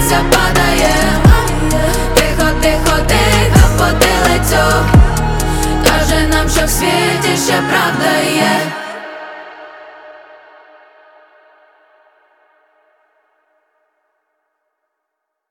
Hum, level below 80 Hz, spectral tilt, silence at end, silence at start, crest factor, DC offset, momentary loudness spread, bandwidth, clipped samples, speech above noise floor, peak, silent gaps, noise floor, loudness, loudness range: none; -20 dBFS; -4.5 dB/octave; 5.35 s; 0 s; 14 dB; under 0.1%; 13 LU; 17.5 kHz; under 0.1%; 63 dB; 0 dBFS; none; -76 dBFS; -12 LUFS; 8 LU